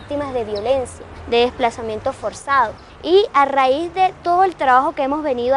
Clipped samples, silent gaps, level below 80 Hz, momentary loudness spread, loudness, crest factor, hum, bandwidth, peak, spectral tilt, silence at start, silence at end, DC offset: under 0.1%; none; -46 dBFS; 10 LU; -18 LUFS; 16 dB; none; 11.5 kHz; -2 dBFS; -4.5 dB/octave; 0 s; 0 s; under 0.1%